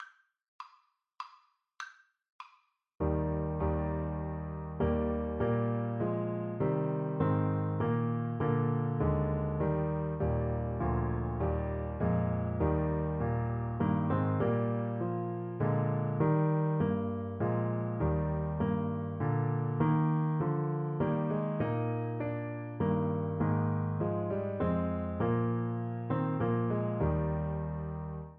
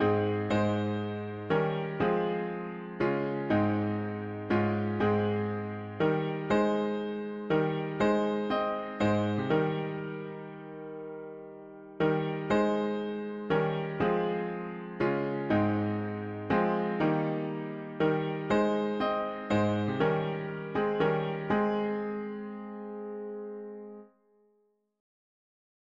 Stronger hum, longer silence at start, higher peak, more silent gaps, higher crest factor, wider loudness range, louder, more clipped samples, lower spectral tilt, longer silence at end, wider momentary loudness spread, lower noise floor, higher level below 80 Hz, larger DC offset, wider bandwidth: neither; about the same, 0 s vs 0 s; about the same, -16 dBFS vs -14 dBFS; first, 0.48-0.59 s, 2.32-2.39 s vs none; about the same, 16 dB vs 16 dB; about the same, 3 LU vs 4 LU; about the same, -32 LUFS vs -30 LUFS; neither; first, -11 dB/octave vs -8 dB/octave; second, 0 s vs 1.95 s; second, 6 LU vs 13 LU; second, -68 dBFS vs -72 dBFS; first, -44 dBFS vs -60 dBFS; neither; second, 5 kHz vs 7.4 kHz